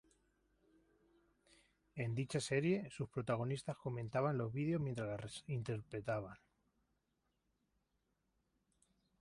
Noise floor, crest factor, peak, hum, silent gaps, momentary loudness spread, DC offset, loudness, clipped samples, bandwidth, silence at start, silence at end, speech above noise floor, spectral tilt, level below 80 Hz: -85 dBFS; 20 dB; -24 dBFS; 50 Hz at -65 dBFS; none; 8 LU; under 0.1%; -41 LUFS; under 0.1%; 11.5 kHz; 1.95 s; 2.85 s; 44 dB; -6.5 dB/octave; -72 dBFS